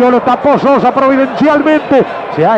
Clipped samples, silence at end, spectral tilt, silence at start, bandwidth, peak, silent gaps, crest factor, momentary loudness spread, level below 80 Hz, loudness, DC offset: under 0.1%; 0 s; -7.5 dB/octave; 0 s; 8.2 kHz; 0 dBFS; none; 8 dB; 3 LU; -48 dBFS; -10 LUFS; under 0.1%